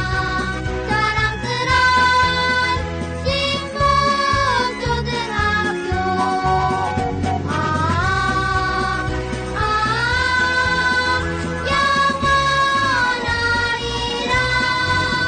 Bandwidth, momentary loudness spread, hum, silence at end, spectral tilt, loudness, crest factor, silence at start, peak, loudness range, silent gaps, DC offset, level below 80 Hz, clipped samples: 9.4 kHz; 6 LU; none; 0 s; -4 dB/octave; -18 LUFS; 12 dB; 0 s; -8 dBFS; 3 LU; none; under 0.1%; -32 dBFS; under 0.1%